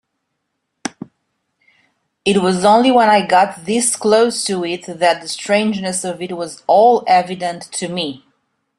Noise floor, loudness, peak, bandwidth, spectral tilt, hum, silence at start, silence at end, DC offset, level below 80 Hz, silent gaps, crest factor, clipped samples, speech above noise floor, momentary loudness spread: -73 dBFS; -15 LUFS; -2 dBFS; 12.5 kHz; -3.5 dB/octave; none; 0.85 s; 0.6 s; under 0.1%; -60 dBFS; none; 16 dB; under 0.1%; 58 dB; 13 LU